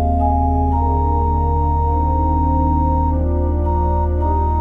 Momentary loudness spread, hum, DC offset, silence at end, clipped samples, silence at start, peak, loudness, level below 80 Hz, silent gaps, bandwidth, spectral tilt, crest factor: 2 LU; none; under 0.1%; 0 s; under 0.1%; 0 s; -6 dBFS; -18 LUFS; -18 dBFS; none; 2.2 kHz; -12 dB/octave; 10 dB